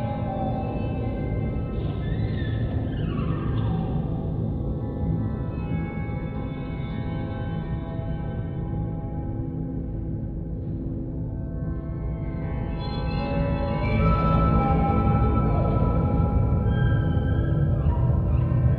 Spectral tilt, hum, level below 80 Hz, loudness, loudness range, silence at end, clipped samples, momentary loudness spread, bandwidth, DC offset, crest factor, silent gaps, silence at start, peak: -11 dB/octave; none; -30 dBFS; -26 LUFS; 8 LU; 0 s; under 0.1%; 9 LU; 4.5 kHz; under 0.1%; 16 dB; none; 0 s; -8 dBFS